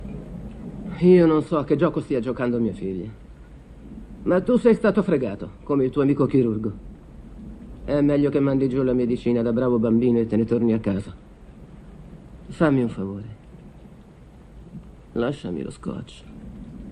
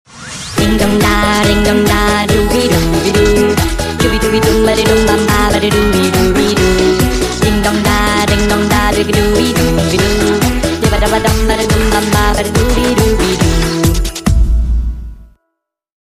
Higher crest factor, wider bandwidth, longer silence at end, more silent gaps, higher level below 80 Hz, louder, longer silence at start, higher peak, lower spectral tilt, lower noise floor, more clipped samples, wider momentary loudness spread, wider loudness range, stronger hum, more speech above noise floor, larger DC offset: first, 18 dB vs 10 dB; second, 10 kHz vs 15.5 kHz; second, 0 s vs 0.8 s; neither; second, -44 dBFS vs -18 dBFS; second, -22 LUFS vs -11 LUFS; second, 0 s vs 0.15 s; second, -6 dBFS vs 0 dBFS; first, -9 dB/octave vs -4.5 dB/octave; second, -46 dBFS vs -72 dBFS; neither; first, 22 LU vs 4 LU; first, 7 LU vs 2 LU; neither; second, 25 dB vs 62 dB; neither